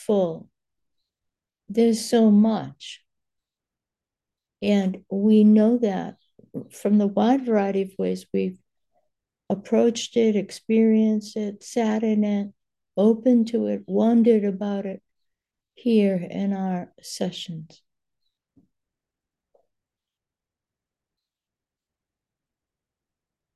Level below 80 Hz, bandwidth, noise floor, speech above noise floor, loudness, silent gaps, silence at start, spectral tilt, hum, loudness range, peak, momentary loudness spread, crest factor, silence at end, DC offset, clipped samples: -70 dBFS; 12 kHz; -90 dBFS; 69 dB; -22 LUFS; none; 0 s; -6.5 dB/octave; none; 6 LU; -6 dBFS; 17 LU; 16 dB; 5.9 s; under 0.1%; under 0.1%